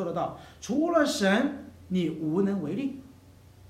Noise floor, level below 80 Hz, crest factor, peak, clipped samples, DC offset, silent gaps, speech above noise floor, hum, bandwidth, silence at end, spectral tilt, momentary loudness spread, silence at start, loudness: -53 dBFS; -60 dBFS; 18 dB; -10 dBFS; under 0.1%; under 0.1%; none; 26 dB; none; 15 kHz; 0.6 s; -5.5 dB/octave; 12 LU; 0 s; -28 LUFS